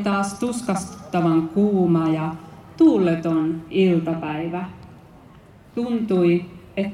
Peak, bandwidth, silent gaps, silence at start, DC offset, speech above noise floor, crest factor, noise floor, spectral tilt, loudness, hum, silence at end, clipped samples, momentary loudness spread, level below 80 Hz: -6 dBFS; 12.5 kHz; none; 0 s; under 0.1%; 27 dB; 16 dB; -47 dBFS; -7 dB/octave; -21 LUFS; none; 0 s; under 0.1%; 11 LU; -56 dBFS